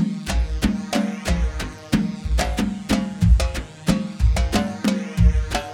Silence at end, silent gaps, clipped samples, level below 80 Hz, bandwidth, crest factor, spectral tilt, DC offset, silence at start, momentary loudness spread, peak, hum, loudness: 0 s; none; under 0.1%; -24 dBFS; 15.5 kHz; 18 dB; -6 dB/octave; under 0.1%; 0 s; 6 LU; -2 dBFS; none; -22 LUFS